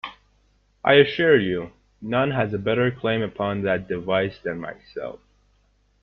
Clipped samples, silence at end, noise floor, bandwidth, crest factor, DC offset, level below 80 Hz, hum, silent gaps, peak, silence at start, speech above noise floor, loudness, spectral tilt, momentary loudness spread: under 0.1%; 0.85 s; -63 dBFS; 5.8 kHz; 20 dB; under 0.1%; -56 dBFS; 50 Hz at -45 dBFS; none; -2 dBFS; 0.05 s; 41 dB; -22 LUFS; -8.5 dB/octave; 18 LU